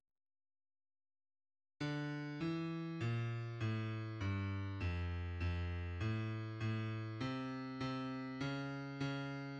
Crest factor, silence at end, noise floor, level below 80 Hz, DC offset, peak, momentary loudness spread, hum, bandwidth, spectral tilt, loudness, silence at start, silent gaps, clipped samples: 14 dB; 0 s; under -90 dBFS; -58 dBFS; under 0.1%; -28 dBFS; 3 LU; none; 8 kHz; -7.5 dB/octave; -42 LUFS; 1.8 s; none; under 0.1%